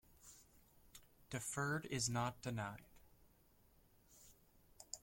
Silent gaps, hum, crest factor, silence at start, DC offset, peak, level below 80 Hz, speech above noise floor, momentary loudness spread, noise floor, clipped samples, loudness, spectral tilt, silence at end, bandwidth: none; none; 20 dB; 0.25 s; under 0.1%; -28 dBFS; -70 dBFS; 28 dB; 24 LU; -71 dBFS; under 0.1%; -43 LUFS; -4 dB/octave; 0.05 s; 16.5 kHz